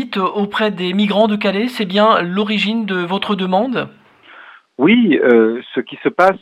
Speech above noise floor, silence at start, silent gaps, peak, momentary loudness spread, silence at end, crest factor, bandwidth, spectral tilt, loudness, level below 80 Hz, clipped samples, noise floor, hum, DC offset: 27 dB; 0 s; none; 0 dBFS; 9 LU; 0.05 s; 16 dB; 13 kHz; -6.5 dB/octave; -15 LUFS; -62 dBFS; under 0.1%; -42 dBFS; none; under 0.1%